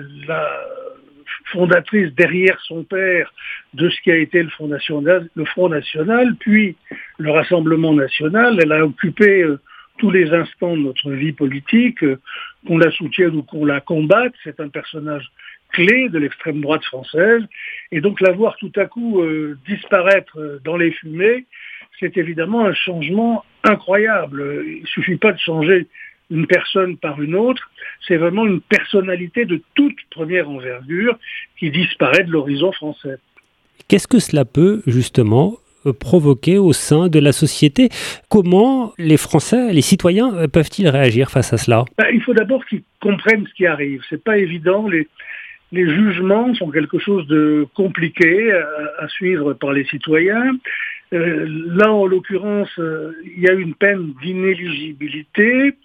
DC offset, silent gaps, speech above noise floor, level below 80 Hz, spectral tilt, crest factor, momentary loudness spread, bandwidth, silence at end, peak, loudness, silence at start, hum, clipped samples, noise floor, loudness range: under 0.1%; none; 40 dB; -52 dBFS; -6 dB/octave; 16 dB; 13 LU; 14.5 kHz; 0.15 s; 0 dBFS; -16 LUFS; 0 s; none; under 0.1%; -55 dBFS; 4 LU